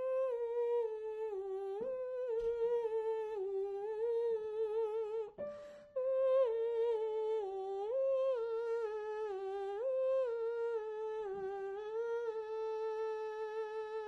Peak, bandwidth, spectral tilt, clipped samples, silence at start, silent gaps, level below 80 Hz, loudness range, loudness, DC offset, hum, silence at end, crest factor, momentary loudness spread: -24 dBFS; 6.4 kHz; -5 dB/octave; under 0.1%; 0 s; none; -74 dBFS; 3 LU; -38 LUFS; under 0.1%; none; 0 s; 14 dB; 7 LU